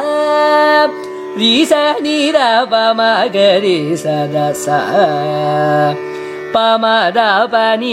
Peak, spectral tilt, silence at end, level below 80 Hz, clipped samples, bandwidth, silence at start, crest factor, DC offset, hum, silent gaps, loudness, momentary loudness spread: 0 dBFS; -4.5 dB/octave; 0 s; -62 dBFS; under 0.1%; 15.5 kHz; 0 s; 12 dB; under 0.1%; none; none; -12 LUFS; 6 LU